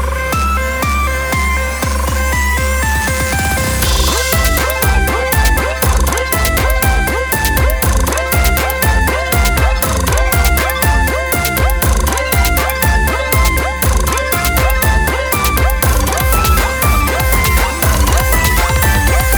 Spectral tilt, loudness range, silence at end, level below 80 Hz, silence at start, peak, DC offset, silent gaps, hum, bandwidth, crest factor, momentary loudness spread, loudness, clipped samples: -4 dB/octave; 1 LU; 0 s; -16 dBFS; 0 s; 0 dBFS; under 0.1%; none; none; over 20 kHz; 12 dB; 3 LU; -13 LUFS; under 0.1%